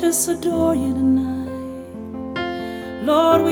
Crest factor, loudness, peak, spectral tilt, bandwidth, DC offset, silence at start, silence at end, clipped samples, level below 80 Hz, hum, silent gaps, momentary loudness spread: 18 dB; -20 LUFS; -2 dBFS; -4.5 dB/octave; 19.5 kHz; under 0.1%; 0 s; 0 s; under 0.1%; -46 dBFS; none; none; 15 LU